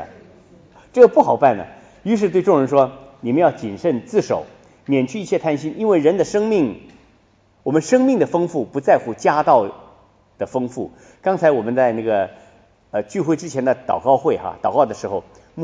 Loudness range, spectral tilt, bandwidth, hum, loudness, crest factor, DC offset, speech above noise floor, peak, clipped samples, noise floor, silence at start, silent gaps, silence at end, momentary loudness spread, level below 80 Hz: 4 LU; -6.5 dB/octave; 9.6 kHz; none; -18 LUFS; 18 dB; under 0.1%; 39 dB; 0 dBFS; under 0.1%; -56 dBFS; 0 s; none; 0 s; 12 LU; -58 dBFS